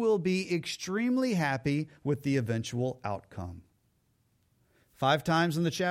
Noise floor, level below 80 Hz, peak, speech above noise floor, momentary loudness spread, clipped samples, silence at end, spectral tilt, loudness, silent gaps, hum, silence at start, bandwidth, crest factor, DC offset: -72 dBFS; -64 dBFS; -14 dBFS; 42 dB; 11 LU; under 0.1%; 0 s; -5.5 dB/octave; -30 LUFS; none; none; 0 s; 16 kHz; 18 dB; under 0.1%